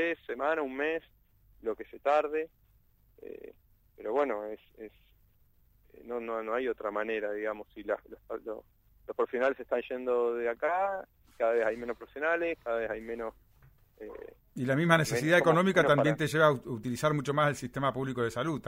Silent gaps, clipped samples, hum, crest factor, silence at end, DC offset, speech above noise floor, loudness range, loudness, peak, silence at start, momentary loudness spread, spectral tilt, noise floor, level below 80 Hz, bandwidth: none; under 0.1%; none; 22 dB; 0 s; under 0.1%; 34 dB; 10 LU; -31 LUFS; -8 dBFS; 0 s; 19 LU; -5.5 dB/octave; -65 dBFS; -64 dBFS; 16 kHz